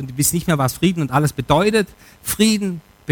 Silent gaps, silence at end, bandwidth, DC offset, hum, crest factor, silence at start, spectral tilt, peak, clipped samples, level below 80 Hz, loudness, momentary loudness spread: none; 0 s; 19.5 kHz; under 0.1%; none; 16 dB; 0 s; -4.5 dB/octave; -2 dBFS; under 0.1%; -44 dBFS; -18 LUFS; 11 LU